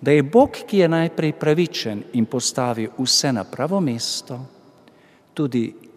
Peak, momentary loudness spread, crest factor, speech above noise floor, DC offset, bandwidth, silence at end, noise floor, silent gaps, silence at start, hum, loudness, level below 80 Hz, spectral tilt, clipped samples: -2 dBFS; 10 LU; 18 dB; 32 dB; under 0.1%; 15.5 kHz; 0.2 s; -52 dBFS; none; 0 s; none; -20 LUFS; -58 dBFS; -4.5 dB/octave; under 0.1%